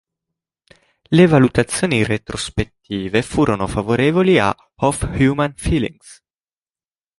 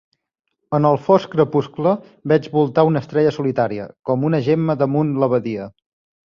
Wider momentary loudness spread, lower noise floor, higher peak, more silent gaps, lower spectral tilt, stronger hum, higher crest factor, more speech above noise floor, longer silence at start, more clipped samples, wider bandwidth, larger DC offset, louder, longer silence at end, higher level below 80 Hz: first, 11 LU vs 7 LU; first, under -90 dBFS vs -75 dBFS; about the same, -2 dBFS vs -2 dBFS; neither; second, -6 dB/octave vs -9 dB/octave; neither; about the same, 16 dB vs 16 dB; first, over 73 dB vs 58 dB; first, 1.1 s vs 0.7 s; neither; first, 11.5 kHz vs 7 kHz; neither; about the same, -17 LUFS vs -18 LUFS; first, 1.05 s vs 0.65 s; first, -36 dBFS vs -58 dBFS